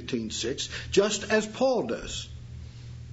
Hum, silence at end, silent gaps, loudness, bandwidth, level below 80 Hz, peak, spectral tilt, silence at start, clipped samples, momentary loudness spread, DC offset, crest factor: none; 0 s; none; -28 LUFS; 8 kHz; -48 dBFS; -10 dBFS; -3.5 dB/octave; 0 s; under 0.1%; 18 LU; under 0.1%; 20 dB